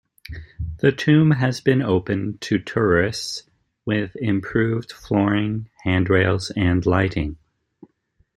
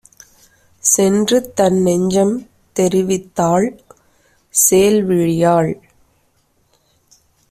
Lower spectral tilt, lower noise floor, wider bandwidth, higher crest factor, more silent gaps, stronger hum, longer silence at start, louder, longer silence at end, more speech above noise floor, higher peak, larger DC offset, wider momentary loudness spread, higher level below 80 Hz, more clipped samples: first, -6.5 dB/octave vs -4.5 dB/octave; about the same, -63 dBFS vs -60 dBFS; second, 12.5 kHz vs 16 kHz; about the same, 18 dB vs 16 dB; neither; neither; second, 0.3 s vs 0.85 s; second, -21 LUFS vs -15 LUFS; second, 1 s vs 1.75 s; about the same, 44 dB vs 46 dB; about the same, -2 dBFS vs 0 dBFS; neither; first, 13 LU vs 8 LU; first, -44 dBFS vs -52 dBFS; neither